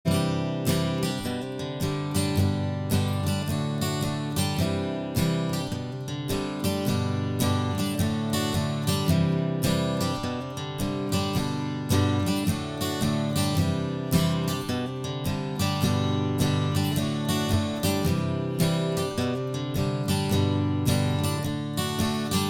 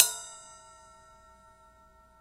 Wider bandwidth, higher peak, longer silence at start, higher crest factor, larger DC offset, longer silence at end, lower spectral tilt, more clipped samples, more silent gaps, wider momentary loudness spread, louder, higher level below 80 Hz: first, over 20 kHz vs 16 kHz; second, -10 dBFS vs 0 dBFS; about the same, 0.05 s vs 0 s; second, 16 dB vs 34 dB; neither; second, 0 s vs 1.8 s; first, -5.5 dB/octave vs 2 dB/octave; neither; neither; second, 5 LU vs 23 LU; about the same, -27 LUFS vs -29 LUFS; first, -50 dBFS vs -66 dBFS